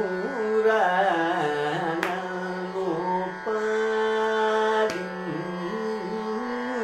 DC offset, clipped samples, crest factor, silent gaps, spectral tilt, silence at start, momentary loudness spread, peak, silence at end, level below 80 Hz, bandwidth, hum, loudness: under 0.1%; under 0.1%; 20 dB; none; -5.5 dB/octave; 0 s; 9 LU; -6 dBFS; 0 s; -66 dBFS; 12.5 kHz; none; -26 LUFS